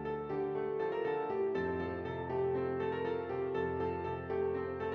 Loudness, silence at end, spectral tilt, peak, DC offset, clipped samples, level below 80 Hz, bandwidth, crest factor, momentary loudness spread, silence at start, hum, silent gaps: -36 LUFS; 0 s; -6 dB/octave; -24 dBFS; under 0.1%; under 0.1%; -66 dBFS; 5.4 kHz; 12 dB; 3 LU; 0 s; none; none